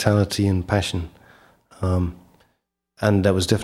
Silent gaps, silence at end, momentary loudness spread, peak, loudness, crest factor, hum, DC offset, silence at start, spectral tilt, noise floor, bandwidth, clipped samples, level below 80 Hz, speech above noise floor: none; 0 s; 10 LU; -2 dBFS; -22 LUFS; 20 dB; none; under 0.1%; 0 s; -6 dB/octave; -72 dBFS; 14.5 kHz; under 0.1%; -42 dBFS; 52 dB